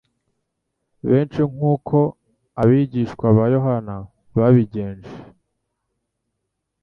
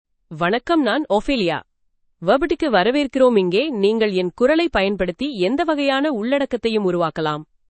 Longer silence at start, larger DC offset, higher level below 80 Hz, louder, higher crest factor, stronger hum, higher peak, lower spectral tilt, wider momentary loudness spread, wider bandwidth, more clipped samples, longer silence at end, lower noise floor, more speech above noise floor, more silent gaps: first, 1.05 s vs 0.3 s; neither; about the same, -50 dBFS vs -46 dBFS; about the same, -19 LUFS vs -19 LUFS; about the same, 18 dB vs 16 dB; neither; about the same, -2 dBFS vs -2 dBFS; first, -11 dB/octave vs -6 dB/octave; first, 17 LU vs 7 LU; second, 5.8 kHz vs 8.8 kHz; neither; first, 1.6 s vs 0.25 s; first, -77 dBFS vs -64 dBFS; first, 60 dB vs 46 dB; neither